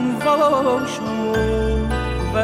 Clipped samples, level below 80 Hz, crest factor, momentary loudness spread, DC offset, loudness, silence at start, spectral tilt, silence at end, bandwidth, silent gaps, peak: under 0.1%; -28 dBFS; 12 dB; 7 LU; under 0.1%; -19 LUFS; 0 s; -6 dB/octave; 0 s; 15.5 kHz; none; -6 dBFS